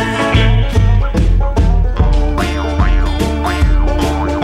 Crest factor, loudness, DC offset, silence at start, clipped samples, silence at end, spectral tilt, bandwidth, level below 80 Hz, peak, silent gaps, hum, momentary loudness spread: 12 dB; -14 LUFS; under 0.1%; 0 s; under 0.1%; 0 s; -6.5 dB/octave; 11.5 kHz; -14 dBFS; 0 dBFS; none; none; 4 LU